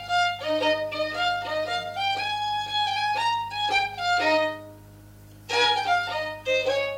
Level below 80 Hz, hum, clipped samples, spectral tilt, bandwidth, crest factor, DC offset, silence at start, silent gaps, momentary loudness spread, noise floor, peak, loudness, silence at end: -58 dBFS; 50 Hz at -60 dBFS; under 0.1%; -2.5 dB/octave; 16 kHz; 16 dB; under 0.1%; 0 s; none; 6 LU; -47 dBFS; -10 dBFS; -25 LUFS; 0 s